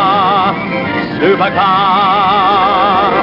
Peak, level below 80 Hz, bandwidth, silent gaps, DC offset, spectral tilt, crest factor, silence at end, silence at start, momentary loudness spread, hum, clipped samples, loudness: 0 dBFS; -44 dBFS; 5.8 kHz; none; under 0.1%; -7 dB/octave; 10 dB; 0 s; 0 s; 6 LU; none; under 0.1%; -11 LUFS